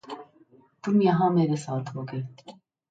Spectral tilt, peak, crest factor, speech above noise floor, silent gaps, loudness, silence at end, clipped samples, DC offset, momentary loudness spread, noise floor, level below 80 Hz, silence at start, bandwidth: -8 dB/octave; -10 dBFS; 16 dB; 34 dB; none; -25 LUFS; 0.4 s; under 0.1%; under 0.1%; 19 LU; -58 dBFS; -70 dBFS; 0.05 s; 9 kHz